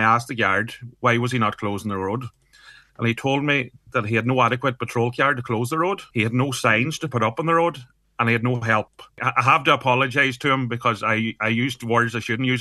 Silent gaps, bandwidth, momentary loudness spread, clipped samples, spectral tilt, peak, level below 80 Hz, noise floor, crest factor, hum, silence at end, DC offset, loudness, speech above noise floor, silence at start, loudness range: none; 12.5 kHz; 8 LU; under 0.1%; -5.5 dB/octave; -2 dBFS; -60 dBFS; -50 dBFS; 20 dB; none; 0 s; under 0.1%; -21 LUFS; 28 dB; 0 s; 4 LU